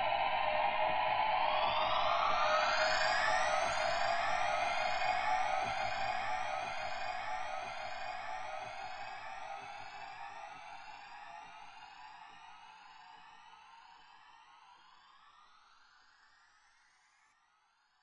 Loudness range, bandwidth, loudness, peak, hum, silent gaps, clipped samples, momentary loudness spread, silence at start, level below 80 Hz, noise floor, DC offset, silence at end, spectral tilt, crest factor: 22 LU; 9.4 kHz; -34 LUFS; -18 dBFS; none; none; under 0.1%; 22 LU; 0 s; -64 dBFS; -73 dBFS; under 0.1%; 3.3 s; -1.5 dB/octave; 18 dB